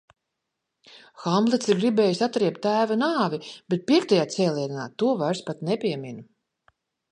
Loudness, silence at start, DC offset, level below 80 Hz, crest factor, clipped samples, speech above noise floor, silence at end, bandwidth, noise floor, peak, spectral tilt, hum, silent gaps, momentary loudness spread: -24 LUFS; 0.95 s; under 0.1%; -74 dBFS; 18 dB; under 0.1%; 58 dB; 0.9 s; 10.5 kHz; -82 dBFS; -8 dBFS; -5.5 dB/octave; none; none; 10 LU